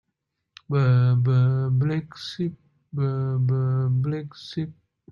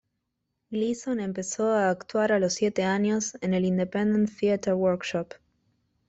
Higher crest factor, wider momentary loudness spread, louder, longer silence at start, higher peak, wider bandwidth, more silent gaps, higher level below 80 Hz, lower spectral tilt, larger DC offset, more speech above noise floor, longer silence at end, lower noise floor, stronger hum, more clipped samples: about the same, 14 dB vs 14 dB; first, 13 LU vs 6 LU; about the same, -24 LUFS vs -26 LUFS; about the same, 0.7 s vs 0.7 s; about the same, -10 dBFS vs -12 dBFS; second, 6.6 kHz vs 8.2 kHz; neither; about the same, -62 dBFS vs -64 dBFS; first, -8.5 dB/octave vs -5.5 dB/octave; neither; about the same, 57 dB vs 55 dB; second, 0.4 s vs 0.75 s; about the same, -79 dBFS vs -80 dBFS; neither; neither